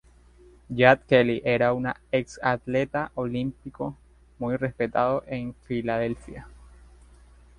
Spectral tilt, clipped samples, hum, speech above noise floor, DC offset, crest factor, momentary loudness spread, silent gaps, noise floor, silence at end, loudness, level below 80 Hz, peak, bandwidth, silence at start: -7 dB/octave; under 0.1%; 60 Hz at -50 dBFS; 29 dB; under 0.1%; 24 dB; 15 LU; none; -54 dBFS; 1.05 s; -25 LUFS; -52 dBFS; -2 dBFS; 10.5 kHz; 0.7 s